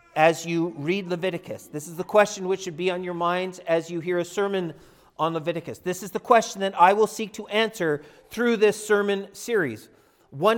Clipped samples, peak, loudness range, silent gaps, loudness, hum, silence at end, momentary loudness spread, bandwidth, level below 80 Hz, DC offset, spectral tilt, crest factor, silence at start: under 0.1%; -2 dBFS; 5 LU; none; -24 LUFS; none; 0 s; 12 LU; 18 kHz; -68 dBFS; under 0.1%; -4.5 dB/octave; 22 dB; 0.15 s